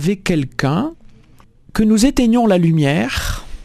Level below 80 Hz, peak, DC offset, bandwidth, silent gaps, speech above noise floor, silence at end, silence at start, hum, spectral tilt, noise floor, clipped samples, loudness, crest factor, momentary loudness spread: -32 dBFS; 0 dBFS; under 0.1%; 14 kHz; none; 32 dB; 0 s; 0 s; none; -6 dB/octave; -46 dBFS; under 0.1%; -16 LUFS; 16 dB; 10 LU